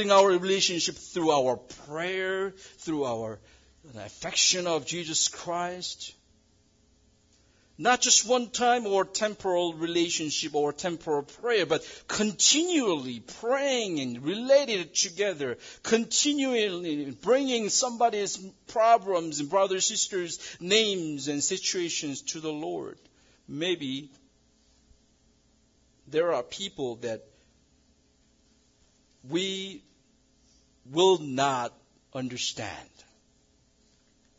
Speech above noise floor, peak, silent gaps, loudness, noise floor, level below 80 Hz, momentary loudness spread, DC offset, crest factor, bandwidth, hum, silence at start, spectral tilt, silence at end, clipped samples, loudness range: 38 dB; -8 dBFS; none; -27 LUFS; -65 dBFS; -68 dBFS; 14 LU; under 0.1%; 22 dB; 7.8 kHz; none; 0 s; -2 dB/octave; 1.55 s; under 0.1%; 10 LU